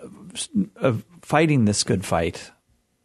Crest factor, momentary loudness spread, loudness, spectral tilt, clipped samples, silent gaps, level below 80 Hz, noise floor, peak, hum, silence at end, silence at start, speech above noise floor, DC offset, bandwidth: 20 dB; 13 LU; -22 LUFS; -5 dB/octave; under 0.1%; none; -52 dBFS; -66 dBFS; -4 dBFS; none; 0.55 s; 0 s; 44 dB; under 0.1%; 12.5 kHz